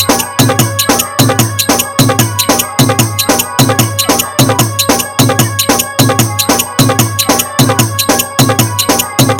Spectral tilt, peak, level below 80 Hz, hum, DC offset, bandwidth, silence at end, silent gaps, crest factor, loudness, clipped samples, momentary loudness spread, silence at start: -3.5 dB/octave; 0 dBFS; -38 dBFS; none; under 0.1%; over 20 kHz; 0 s; none; 10 dB; -9 LUFS; 0.9%; 1 LU; 0 s